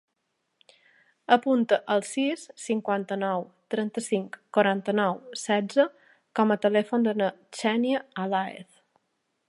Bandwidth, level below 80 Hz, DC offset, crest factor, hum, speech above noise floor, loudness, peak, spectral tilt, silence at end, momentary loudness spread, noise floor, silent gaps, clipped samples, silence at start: 11.5 kHz; -80 dBFS; under 0.1%; 24 dB; none; 52 dB; -26 LUFS; -4 dBFS; -5 dB/octave; 0.85 s; 8 LU; -78 dBFS; none; under 0.1%; 1.3 s